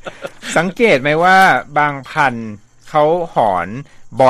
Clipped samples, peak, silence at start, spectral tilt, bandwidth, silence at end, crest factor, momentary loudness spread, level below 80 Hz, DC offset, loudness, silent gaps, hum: under 0.1%; 0 dBFS; 0.05 s; -5 dB/octave; 15.5 kHz; 0 s; 14 dB; 19 LU; -48 dBFS; under 0.1%; -14 LUFS; none; none